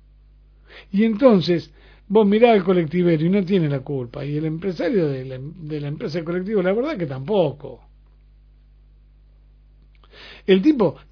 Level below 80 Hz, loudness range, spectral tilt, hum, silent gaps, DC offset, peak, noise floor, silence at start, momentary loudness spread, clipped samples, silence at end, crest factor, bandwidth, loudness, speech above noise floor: -50 dBFS; 10 LU; -9 dB/octave; 50 Hz at -50 dBFS; none; under 0.1%; 0 dBFS; -50 dBFS; 0.7 s; 14 LU; under 0.1%; 0.15 s; 20 dB; 5.4 kHz; -20 LUFS; 31 dB